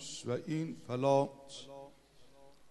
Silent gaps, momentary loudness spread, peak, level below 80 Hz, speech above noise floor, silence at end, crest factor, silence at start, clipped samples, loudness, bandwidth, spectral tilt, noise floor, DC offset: none; 21 LU; -16 dBFS; -72 dBFS; 27 dB; 0 s; 22 dB; 0 s; under 0.1%; -35 LUFS; 12 kHz; -6 dB/octave; -61 dBFS; under 0.1%